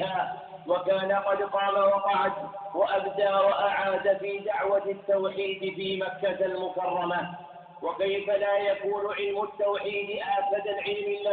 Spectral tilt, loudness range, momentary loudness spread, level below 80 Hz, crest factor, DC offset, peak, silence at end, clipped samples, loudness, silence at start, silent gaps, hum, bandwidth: -8.5 dB/octave; 4 LU; 8 LU; -70 dBFS; 16 dB; under 0.1%; -12 dBFS; 0 s; under 0.1%; -28 LUFS; 0 s; none; none; 4.6 kHz